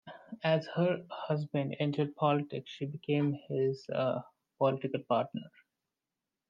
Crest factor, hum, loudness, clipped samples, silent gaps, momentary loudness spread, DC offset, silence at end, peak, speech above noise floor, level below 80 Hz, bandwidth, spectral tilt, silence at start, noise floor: 18 dB; none; -33 LUFS; under 0.1%; none; 9 LU; under 0.1%; 1 s; -16 dBFS; 57 dB; -82 dBFS; 7.4 kHz; -8.5 dB/octave; 0.05 s; -90 dBFS